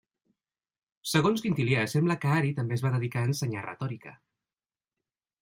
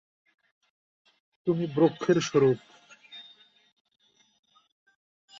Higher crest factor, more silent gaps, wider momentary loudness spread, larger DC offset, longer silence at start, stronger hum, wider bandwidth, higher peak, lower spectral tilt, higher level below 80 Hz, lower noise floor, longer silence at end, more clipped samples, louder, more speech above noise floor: about the same, 20 dB vs 20 dB; neither; second, 11 LU vs 23 LU; neither; second, 1.05 s vs 1.45 s; neither; first, 16 kHz vs 7.6 kHz; about the same, -10 dBFS vs -10 dBFS; about the same, -6 dB/octave vs -6 dB/octave; about the same, -66 dBFS vs -70 dBFS; first, under -90 dBFS vs -57 dBFS; second, 1.3 s vs 2.2 s; neither; about the same, -28 LUFS vs -26 LUFS; first, over 62 dB vs 33 dB